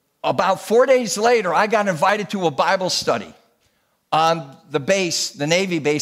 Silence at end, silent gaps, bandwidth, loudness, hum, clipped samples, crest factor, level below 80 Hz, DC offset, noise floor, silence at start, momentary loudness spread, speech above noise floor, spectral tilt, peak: 0 s; none; 16 kHz; -19 LUFS; none; under 0.1%; 16 dB; -64 dBFS; under 0.1%; -65 dBFS; 0.25 s; 7 LU; 46 dB; -3.5 dB/octave; -4 dBFS